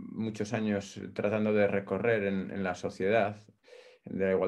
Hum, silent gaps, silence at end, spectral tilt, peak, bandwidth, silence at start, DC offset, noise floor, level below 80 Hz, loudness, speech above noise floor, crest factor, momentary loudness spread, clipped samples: none; none; 0 s; -6.5 dB/octave; -14 dBFS; 11 kHz; 0 s; under 0.1%; -56 dBFS; -72 dBFS; -31 LUFS; 26 dB; 18 dB; 10 LU; under 0.1%